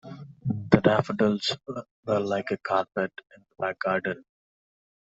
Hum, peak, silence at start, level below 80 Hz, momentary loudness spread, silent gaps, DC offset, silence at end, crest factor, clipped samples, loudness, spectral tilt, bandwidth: none; 0 dBFS; 0.05 s; -58 dBFS; 14 LU; 1.91-2.03 s; under 0.1%; 0.85 s; 28 dB; under 0.1%; -27 LUFS; -6.5 dB/octave; 8 kHz